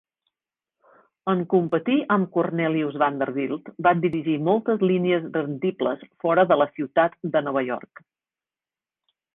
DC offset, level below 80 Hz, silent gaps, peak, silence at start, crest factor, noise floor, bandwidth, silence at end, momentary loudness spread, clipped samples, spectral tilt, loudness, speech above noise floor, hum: under 0.1%; -66 dBFS; none; -6 dBFS; 1.25 s; 18 dB; under -90 dBFS; 3.9 kHz; 1.55 s; 7 LU; under 0.1%; -10 dB/octave; -23 LUFS; over 67 dB; none